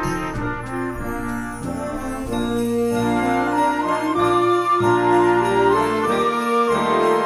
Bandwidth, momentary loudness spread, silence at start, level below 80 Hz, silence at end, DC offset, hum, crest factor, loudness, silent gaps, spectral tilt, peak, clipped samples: 15.5 kHz; 10 LU; 0 s; -40 dBFS; 0 s; under 0.1%; none; 14 dB; -20 LUFS; none; -6 dB/octave; -6 dBFS; under 0.1%